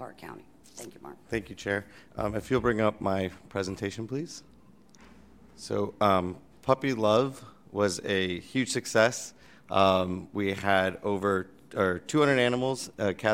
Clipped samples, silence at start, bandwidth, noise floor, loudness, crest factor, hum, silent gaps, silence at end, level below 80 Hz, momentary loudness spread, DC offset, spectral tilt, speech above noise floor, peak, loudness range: under 0.1%; 0 s; 16.5 kHz; -57 dBFS; -28 LUFS; 22 dB; none; none; 0 s; -58 dBFS; 20 LU; 0.1%; -5 dB/octave; 29 dB; -8 dBFS; 5 LU